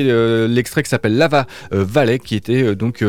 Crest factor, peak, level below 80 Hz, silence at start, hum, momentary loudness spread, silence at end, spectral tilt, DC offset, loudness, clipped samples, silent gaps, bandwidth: 14 dB; -2 dBFS; -48 dBFS; 0 s; none; 5 LU; 0 s; -6.5 dB/octave; under 0.1%; -16 LUFS; under 0.1%; none; 17 kHz